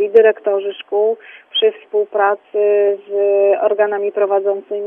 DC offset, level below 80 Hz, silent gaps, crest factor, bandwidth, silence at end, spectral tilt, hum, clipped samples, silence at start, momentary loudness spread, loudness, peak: under 0.1%; -76 dBFS; none; 14 dB; 3.6 kHz; 0 s; -6 dB/octave; none; under 0.1%; 0 s; 7 LU; -16 LUFS; 0 dBFS